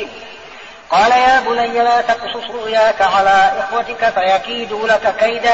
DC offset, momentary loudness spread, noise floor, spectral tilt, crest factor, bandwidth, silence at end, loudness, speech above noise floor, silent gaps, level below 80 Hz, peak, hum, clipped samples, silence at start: 0.4%; 17 LU; -36 dBFS; 0.5 dB/octave; 12 dB; 8 kHz; 0 s; -14 LUFS; 22 dB; none; -48 dBFS; -4 dBFS; none; under 0.1%; 0 s